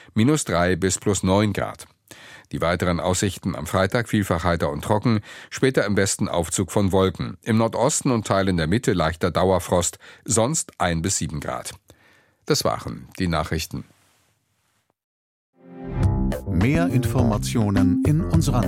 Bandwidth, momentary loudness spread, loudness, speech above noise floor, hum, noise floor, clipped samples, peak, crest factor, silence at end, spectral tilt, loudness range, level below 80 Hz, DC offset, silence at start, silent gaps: 16.5 kHz; 11 LU; -22 LUFS; 47 dB; none; -69 dBFS; under 0.1%; -4 dBFS; 18 dB; 0 s; -5 dB/octave; 7 LU; -38 dBFS; under 0.1%; 0.15 s; 15.04-15.53 s